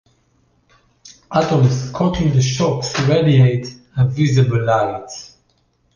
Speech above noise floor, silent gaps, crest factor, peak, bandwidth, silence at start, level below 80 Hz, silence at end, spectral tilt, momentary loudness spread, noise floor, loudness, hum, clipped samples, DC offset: 46 dB; none; 14 dB; -2 dBFS; 7.2 kHz; 1.05 s; -42 dBFS; 0.7 s; -6.5 dB/octave; 11 LU; -61 dBFS; -16 LUFS; none; under 0.1%; under 0.1%